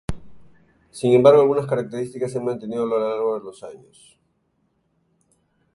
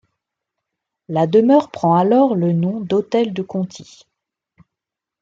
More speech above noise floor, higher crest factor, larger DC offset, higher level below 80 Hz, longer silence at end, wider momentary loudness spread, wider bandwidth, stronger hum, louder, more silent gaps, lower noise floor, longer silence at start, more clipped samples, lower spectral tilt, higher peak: second, 48 dB vs 68 dB; about the same, 20 dB vs 16 dB; neither; first, -48 dBFS vs -64 dBFS; first, 2 s vs 1.4 s; first, 24 LU vs 11 LU; first, 11.5 kHz vs 7.6 kHz; neither; second, -20 LUFS vs -17 LUFS; neither; second, -68 dBFS vs -85 dBFS; second, 0.1 s vs 1.1 s; neither; about the same, -7 dB/octave vs -8 dB/octave; about the same, -2 dBFS vs -2 dBFS